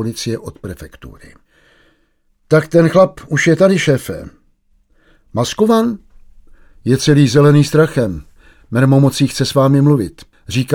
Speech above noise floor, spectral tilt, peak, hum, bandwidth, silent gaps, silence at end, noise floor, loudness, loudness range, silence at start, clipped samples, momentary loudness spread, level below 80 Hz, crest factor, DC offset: 46 dB; -6.5 dB/octave; 0 dBFS; none; 16.5 kHz; none; 0 s; -59 dBFS; -13 LUFS; 5 LU; 0 s; under 0.1%; 17 LU; -44 dBFS; 14 dB; under 0.1%